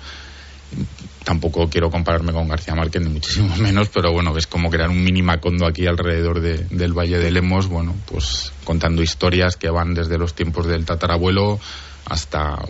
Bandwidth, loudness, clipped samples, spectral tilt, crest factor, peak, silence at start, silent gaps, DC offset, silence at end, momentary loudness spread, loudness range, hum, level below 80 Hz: 8 kHz; -19 LUFS; under 0.1%; -5 dB/octave; 14 dB; -4 dBFS; 0 s; none; under 0.1%; 0 s; 10 LU; 2 LU; none; -28 dBFS